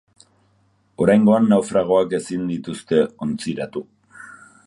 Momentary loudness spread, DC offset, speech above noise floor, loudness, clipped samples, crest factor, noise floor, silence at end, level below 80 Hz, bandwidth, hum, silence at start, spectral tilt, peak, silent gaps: 14 LU; under 0.1%; 43 dB; -19 LUFS; under 0.1%; 18 dB; -61 dBFS; 0.35 s; -56 dBFS; 11.5 kHz; none; 1 s; -6.5 dB/octave; -2 dBFS; none